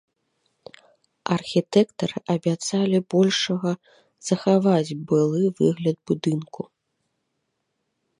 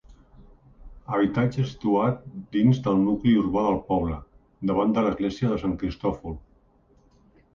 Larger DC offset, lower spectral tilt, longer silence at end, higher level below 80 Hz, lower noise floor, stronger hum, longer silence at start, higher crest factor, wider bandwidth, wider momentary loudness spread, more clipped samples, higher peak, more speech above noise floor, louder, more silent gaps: neither; second, -6 dB/octave vs -8.5 dB/octave; first, 1.55 s vs 1.15 s; second, -68 dBFS vs -46 dBFS; first, -76 dBFS vs -60 dBFS; neither; first, 1.25 s vs 0.1 s; about the same, 18 dB vs 16 dB; first, 11 kHz vs 7.2 kHz; about the same, 11 LU vs 10 LU; neither; about the same, -6 dBFS vs -8 dBFS; first, 54 dB vs 36 dB; about the same, -23 LUFS vs -25 LUFS; neither